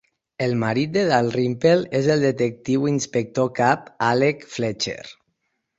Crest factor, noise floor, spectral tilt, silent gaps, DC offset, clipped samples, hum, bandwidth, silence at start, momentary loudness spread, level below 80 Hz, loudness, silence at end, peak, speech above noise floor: 18 dB; -74 dBFS; -5.5 dB/octave; none; under 0.1%; under 0.1%; none; 8 kHz; 0.4 s; 8 LU; -58 dBFS; -21 LUFS; 0.65 s; -2 dBFS; 53 dB